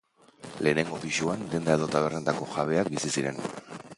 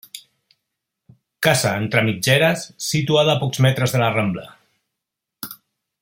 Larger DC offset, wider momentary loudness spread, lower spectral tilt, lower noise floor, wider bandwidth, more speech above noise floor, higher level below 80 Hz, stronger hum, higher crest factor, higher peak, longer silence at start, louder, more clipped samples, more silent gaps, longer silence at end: neither; second, 11 LU vs 17 LU; about the same, -4.5 dB/octave vs -4.5 dB/octave; second, -48 dBFS vs -82 dBFS; second, 11.5 kHz vs 16.5 kHz; second, 20 dB vs 64 dB; about the same, -60 dBFS vs -58 dBFS; neither; about the same, 22 dB vs 20 dB; second, -8 dBFS vs 0 dBFS; first, 0.4 s vs 0.15 s; second, -28 LUFS vs -18 LUFS; neither; neither; second, 0.05 s vs 0.45 s